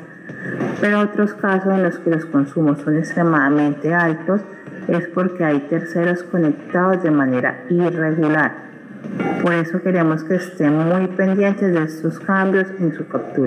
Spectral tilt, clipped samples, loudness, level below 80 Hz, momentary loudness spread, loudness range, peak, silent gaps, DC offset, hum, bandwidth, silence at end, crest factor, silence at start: -8.5 dB/octave; under 0.1%; -18 LUFS; -70 dBFS; 8 LU; 1 LU; -2 dBFS; none; under 0.1%; none; 10.5 kHz; 0 s; 16 dB; 0 s